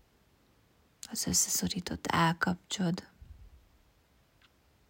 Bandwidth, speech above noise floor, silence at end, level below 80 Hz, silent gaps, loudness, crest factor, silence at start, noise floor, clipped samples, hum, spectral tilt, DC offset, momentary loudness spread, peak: 16.5 kHz; 36 dB; 1.4 s; -60 dBFS; none; -31 LUFS; 22 dB; 1.1 s; -67 dBFS; under 0.1%; none; -3 dB/octave; under 0.1%; 12 LU; -14 dBFS